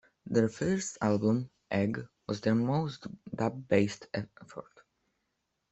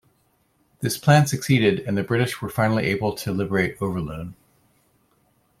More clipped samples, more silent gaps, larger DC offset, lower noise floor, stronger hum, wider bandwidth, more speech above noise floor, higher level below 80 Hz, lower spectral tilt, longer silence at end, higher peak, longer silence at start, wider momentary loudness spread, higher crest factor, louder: neither; neither; neither; first, -81 dBFS vs -65 dBFS; neither; second, 8.2 kHz vs 16 kHz; first, 51 dB vs 44 dB; second, -66 dBFS vs -54 dBFS; about the same, -6.5 dB/octave vs -6 dB/octave; second, 1.1 s vs 1.25 s; second, -10 dBFS vs -4 dBFS; second, 0.25 s vs 0.8 s; first, 15 LU vs 12 LU; about the same, 22 dB vs 20 dB; second, -31 LUFS vs -22 LUFS